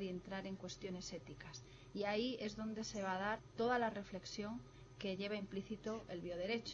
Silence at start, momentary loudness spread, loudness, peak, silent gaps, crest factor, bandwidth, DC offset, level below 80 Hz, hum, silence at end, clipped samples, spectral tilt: 0 s; 13 LU; -44 LUFS; -26 dBFS; none; 18 dB; 7.8 kHz; under 0.1%; -66 dBFS; none; 0 s; under 0.1%; -4.5 dB/octave